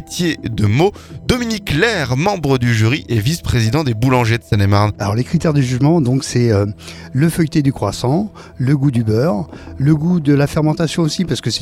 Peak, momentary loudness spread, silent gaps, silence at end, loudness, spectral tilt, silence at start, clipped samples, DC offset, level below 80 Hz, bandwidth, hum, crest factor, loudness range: 0 dBFS; 5 LU; none; 0 s; -16 LUFS; -6 dB/octave; 0 s; under 0.1%; under 0.1%; -38 dBFS; 15.5 kHz; none; 16 dB; 1 LU